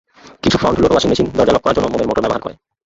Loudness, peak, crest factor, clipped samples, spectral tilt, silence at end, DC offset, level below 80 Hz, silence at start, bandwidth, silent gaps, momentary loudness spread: -15 LUFS; 0 dBFS; 14 dB; under 0.1%; -5.5 dB/octave; 0.35 s; under 0.1%; -36 dBFS; 0.25 s; 8 kHz; none; 7 LU